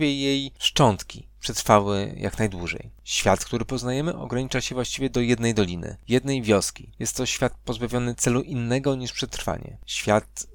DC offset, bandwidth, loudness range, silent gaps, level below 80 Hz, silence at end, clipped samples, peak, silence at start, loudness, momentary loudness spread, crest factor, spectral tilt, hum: under 0.1%; 18 kHz; 3 LU; none; -44 dBFS; 0 s; under 0.1%; -2 dBFS; 0 s; -25 LUFS; 11 LU; 22 dB; -4.5 dB/octave; none